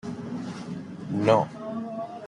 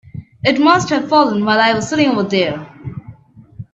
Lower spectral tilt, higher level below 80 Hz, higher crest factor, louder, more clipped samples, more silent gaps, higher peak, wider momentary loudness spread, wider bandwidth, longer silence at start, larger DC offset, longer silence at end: first, -7 dB/octave vs -5 dB/octave; second, -66 dBFS vs -52 dBFS; first, 22 dB vs 16 dB; second, -28 LUFS vs -14 LUFS; neither; neither; second, -6 dBFS vs 0 dBFS; second, 14 LU vs 19 LU; first, 11 kHz vs 8 kHz; about the same, 0.05 s vs 0.15 s; neither; about the same, 0 s vs 0.1 s